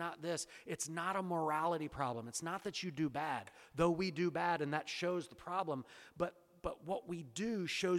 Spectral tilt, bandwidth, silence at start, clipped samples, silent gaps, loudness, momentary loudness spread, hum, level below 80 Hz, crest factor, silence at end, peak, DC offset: -4.5 dB/octave; 15.5 kHz; 0 s; under 0.1%; none; -40 LUFS; 9 LU; none; -66 dBFS; 20 dB; 0 s; -20 dBFS; under 0.1%